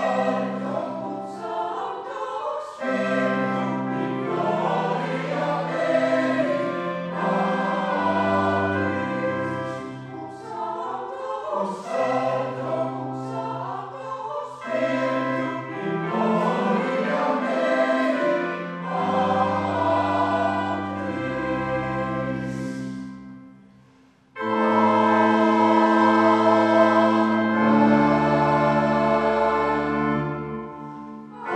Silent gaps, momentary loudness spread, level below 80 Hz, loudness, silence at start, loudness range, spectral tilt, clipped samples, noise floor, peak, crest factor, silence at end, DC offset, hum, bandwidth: none; 14 LU; -56 dBFS; -23 LUFS; 0 s; 9 LU; -7 dB/octave; under 0.1%; -55 dBFS; -6 dBFS; 18 dB; 0 s; under 0.1%; none; 9.6 kHz